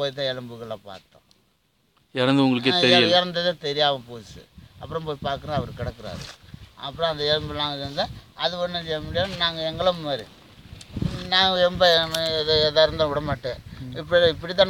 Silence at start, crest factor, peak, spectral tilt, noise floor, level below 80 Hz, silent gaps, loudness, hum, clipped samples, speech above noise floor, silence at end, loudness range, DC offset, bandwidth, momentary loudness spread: 0 s; 20 dB; -4 dBFS; -5 dB/octave; -66 dBFS; -48 dBFS; none; -22 LUFS; none; under 0.1%; 43 dB; 0 s; 7 LU; under 0.1%; 17 kHz; 18 LU